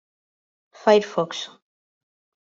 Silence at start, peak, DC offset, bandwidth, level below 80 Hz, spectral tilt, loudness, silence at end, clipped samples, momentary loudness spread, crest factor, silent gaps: 0.85 s; -4 dBFS; under 0.1%; 7.6 kHz; -74 dBFS; -4.5 dB/octave; -21 LUFS; 0.95 s; under 0.1%; 15 LU; 22 dB; none